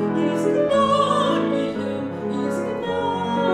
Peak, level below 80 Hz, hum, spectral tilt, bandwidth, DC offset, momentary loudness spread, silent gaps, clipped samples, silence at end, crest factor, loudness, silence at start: -6 dBFS; -58 dBFS; none; -6 dB/octave; 12.5 kHz; under 0.1%; 8 LU; none; under 0.1%; 0 s; 16 dB; -21 LUFS; 0 s